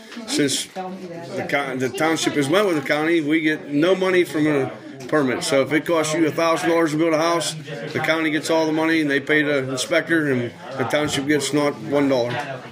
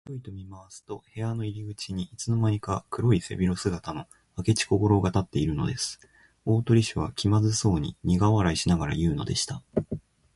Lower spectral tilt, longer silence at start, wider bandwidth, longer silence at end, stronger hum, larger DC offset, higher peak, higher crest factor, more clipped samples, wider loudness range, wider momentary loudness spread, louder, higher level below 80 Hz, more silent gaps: second, -4.5 dB/octave vs -6 dB/octave; about the same, 0 s vs 0.05 s; first, 16 kHz vs 11.5 kHz; second, 0 s vs 0.4 s; neither; neither; first, -4 dBFS vs -8 dBFS; about the same, 18 dB vs 18 dB; neither; second, 1 LU vs 4 LU; second, 9 LU vs 17 LU; first, -20 LUFS vs -26 LUFS; second, -64 dBFS vs -44 dBFS; neither